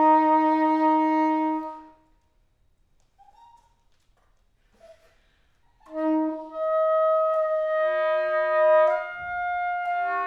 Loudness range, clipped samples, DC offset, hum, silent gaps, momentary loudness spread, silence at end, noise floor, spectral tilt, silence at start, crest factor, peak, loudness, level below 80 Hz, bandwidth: 11 LU; under 0.1%; under 0.1%; none; none; 11 LU; 0 s; -64 dBFS; -6 dB/octave; 0 s; 16 dB; -10 dBFS; -23 LUFS; -64 dBFS; 6 kHz